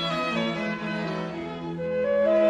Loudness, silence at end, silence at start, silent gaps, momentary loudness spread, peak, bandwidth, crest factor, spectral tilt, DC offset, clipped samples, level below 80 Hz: -28 LUFS; 0 s; 0 s; none; 9 LU; -12 dBFS; 10 kHz; 14 dB; -6 dB/octave; under 0.1%; under 0.1%; -58 dBFS